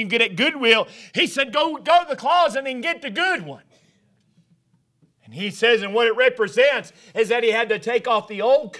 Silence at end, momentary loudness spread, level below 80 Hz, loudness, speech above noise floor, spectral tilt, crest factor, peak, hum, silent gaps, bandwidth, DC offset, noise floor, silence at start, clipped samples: 0 s; 8 LU; -70 dBFS; -20 LUFS; 43 dB; -3.5 dB/octave; 22 dB; 0 dBFS; none; none; 11 kHz; under 0.1%; -63 dBFS; 0 s; under 0.1%